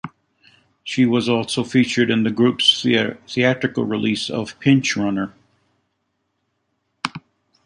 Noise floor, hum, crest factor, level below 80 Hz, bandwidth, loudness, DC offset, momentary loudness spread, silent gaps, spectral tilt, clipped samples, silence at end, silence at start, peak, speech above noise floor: -72 dBFS; none; 18 dB; -58 dBFS; 10.5 kHz; -19 LUFS; under 0.1%; 14 LU; none; -5 dB/octave; under 0.1%; 0.45 s; 0.05 s; -2 dBFS; 54 dB